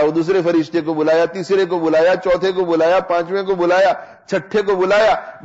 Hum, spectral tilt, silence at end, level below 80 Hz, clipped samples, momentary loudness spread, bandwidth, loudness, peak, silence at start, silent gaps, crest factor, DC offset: none; -6 dB/octave; 0 s; -52 dBFS; under 0.1%; 6 LU; 8 kHz; -16 LUFS; -6 dBFS; 0 s; none; 8 dB; under 0.1%